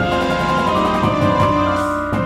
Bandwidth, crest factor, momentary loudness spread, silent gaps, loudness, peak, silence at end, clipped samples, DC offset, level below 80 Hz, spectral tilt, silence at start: 15.5 kHz; 14 dB; 3 LU; none; -16 LUFS; -2 dBFS; 0 s; under 0.1%; under 0.1%; -36 dBFS; -6.5 dB/octave; 0 s